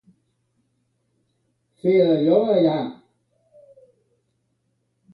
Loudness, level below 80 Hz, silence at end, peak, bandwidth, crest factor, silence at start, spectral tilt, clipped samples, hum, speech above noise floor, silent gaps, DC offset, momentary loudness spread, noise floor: -19 LUFS; -70 dBFS; 2.2 s; -4 dBFS; 5.2 kHz; 20 dB; 1.85 s; -9.5 dB/octave; under 0.1%; none; 53 dB; none; under 0.1%; 10 LU; -71 dBFS